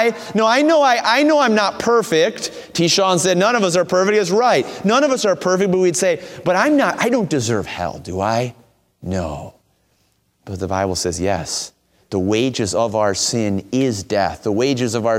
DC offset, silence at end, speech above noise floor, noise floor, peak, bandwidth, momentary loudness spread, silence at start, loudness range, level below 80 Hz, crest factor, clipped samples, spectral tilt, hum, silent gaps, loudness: under 0.1%; 0 s; 46 dB; -63 dBFS; -2 dBFS; 16.5 kHz; 11 LU; 0 s; 9 LU; -50 dBFS; 16 dB; under 0.1%; -4 dB/octave; none; none; -17 LUFS